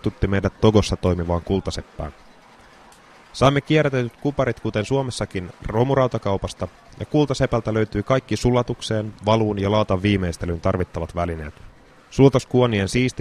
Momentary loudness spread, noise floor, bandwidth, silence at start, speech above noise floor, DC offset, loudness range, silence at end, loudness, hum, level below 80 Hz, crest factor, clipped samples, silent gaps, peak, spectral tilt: 13 LU; -48 dBFS; 13 kHz; 0.05 s; 28 dB; under 0.1%; 2 LU; 0 s; -21 LUFS; none; -40 dBFS; 20 dB; under 0.1%; none; -2 dBFS; -6.5 dB/octave